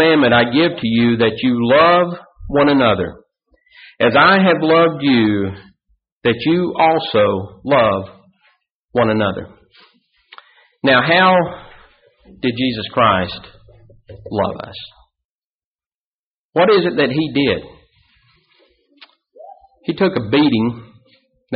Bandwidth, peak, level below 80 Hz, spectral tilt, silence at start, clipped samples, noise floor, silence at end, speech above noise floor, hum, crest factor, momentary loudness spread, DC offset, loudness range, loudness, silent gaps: 5.2 kHz; -2 dBFS; -48 dBFS; -3.5 dB/octave; 0 s; under 0.1%; under -90 dBFS; 0 s; over 75 dB; none; 16 dB; 14 LU; under 0.1%; 7 LU; -15 LUFS; 6.12-6.21 s, 8.71-8.89 s, 15.25-15.79 s, 15.86-16.53 s